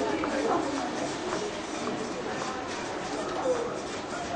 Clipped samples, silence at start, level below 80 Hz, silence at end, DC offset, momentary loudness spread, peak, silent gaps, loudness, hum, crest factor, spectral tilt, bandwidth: under 0.1%; 0 s; -58 dBFS; 0 s; under 0.1%; 6 LU; -14 dBFS; none; -31 LUFS; none; 16 dB; -4 dB/octave; 10 kHz